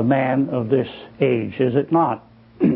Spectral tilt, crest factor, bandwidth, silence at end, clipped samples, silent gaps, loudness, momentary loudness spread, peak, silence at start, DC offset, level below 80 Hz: -12.5 dB/octave; 16 dB; 4.8 kHz; 0 s; under 0.1%; none; -20 LUFS; 5 LU; -4 dBFS; 0 s; under 0.1%; -56 dBFS